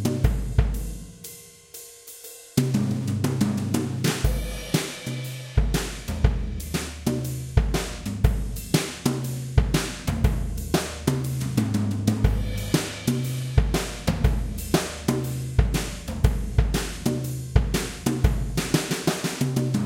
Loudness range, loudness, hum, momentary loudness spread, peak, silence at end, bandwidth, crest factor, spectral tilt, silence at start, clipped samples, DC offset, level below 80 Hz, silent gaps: 2 LU; -26 LUFS; none; 7 LU; -4 dBFS; 0 s; 17 kHz; 22 dB; -5.5 dB/octave; 0 s; under 0.1%; under 0.1%; -30 dBFS; none